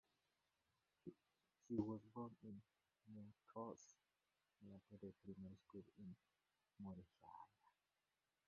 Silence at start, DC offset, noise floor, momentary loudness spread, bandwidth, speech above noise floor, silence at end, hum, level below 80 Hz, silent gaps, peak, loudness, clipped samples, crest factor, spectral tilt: 1.05 s; under 0.1%; under -90 dBFS; 15 LU; 6.6 kHz; over 34 dB; 0.8 s; none; -82 dBFS; none; -32 dBFS; -57 LUFS; under 0.1%; 26 dB; -9.5 dB/octave